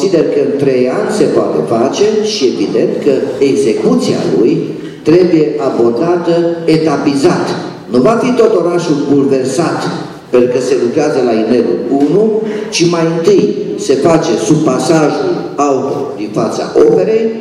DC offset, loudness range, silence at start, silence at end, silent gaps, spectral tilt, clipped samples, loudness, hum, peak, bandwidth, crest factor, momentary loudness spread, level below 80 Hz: under 0.1%; 1 LU; 0 s; 0 s; none; -6 dB/octave; 0.2%; -11 LUFS; none; 0 dBFS; 12 kHz; 10 dB; 6 LU; -50 dBFS